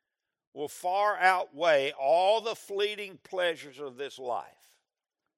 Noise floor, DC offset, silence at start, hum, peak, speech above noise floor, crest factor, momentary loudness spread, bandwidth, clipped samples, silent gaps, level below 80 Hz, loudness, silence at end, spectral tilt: -88 dBFS; under 0.1%; 0.55 s; none; -8 dBFS; 59 dB; 22 dB; 15 LU; 16 kHz; under 0.1%; none; under -90 dBFS; -29 LUFS; 0.9 s; -2.5 dB/octave